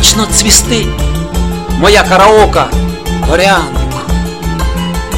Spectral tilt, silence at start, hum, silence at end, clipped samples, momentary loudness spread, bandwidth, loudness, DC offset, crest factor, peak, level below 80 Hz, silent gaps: -3.5 dB/octave; 0 s; none; 0 s; 0.8%; 11 LU; over 20 kHz; -9 LUFS; 2%; 10 dB; 0 dBFS; -16 dBFS; none